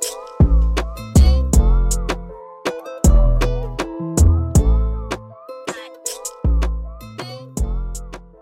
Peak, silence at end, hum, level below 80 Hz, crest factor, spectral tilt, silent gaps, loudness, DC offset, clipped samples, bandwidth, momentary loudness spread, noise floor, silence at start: -4 dBFS; 0.2 s; none; -18 dBFS; 14 dB; -5.5 dB/octave; none; -19 LUFS; under 0.1%; under 0.1%; 16 kHz; 16 LU; -36 dBFS; 0 s